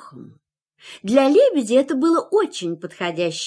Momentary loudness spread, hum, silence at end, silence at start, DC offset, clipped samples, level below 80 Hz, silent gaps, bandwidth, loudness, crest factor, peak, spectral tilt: 12 LU; none; 0 s; 0.05 s; under 0.1%; under 0.1%; -72 dBFS; none; 11 kHz; -19 LUFS; 16 dB; -4 dBFS; -4.5 dB/octave